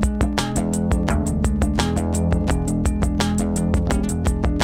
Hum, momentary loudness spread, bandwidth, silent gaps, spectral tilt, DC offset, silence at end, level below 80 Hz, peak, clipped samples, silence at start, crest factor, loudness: none; 1 LU; 16 kHz; none; -6 dB/octave; under 0.1%; 0 s; -24 dBFS; -4 dBFS; under 0.1%; 0 s; 16 dB; -21 LUFS